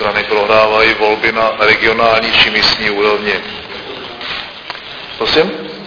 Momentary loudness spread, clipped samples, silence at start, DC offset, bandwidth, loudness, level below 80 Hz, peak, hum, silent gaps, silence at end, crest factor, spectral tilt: 16 LU; 0.1%; 0 s; under 0.1%; 5.4 kHz; -11 LUFS; -42 dBFS; 0 dBFS; none; none; 0 s; 14 dB; -4 dB/octave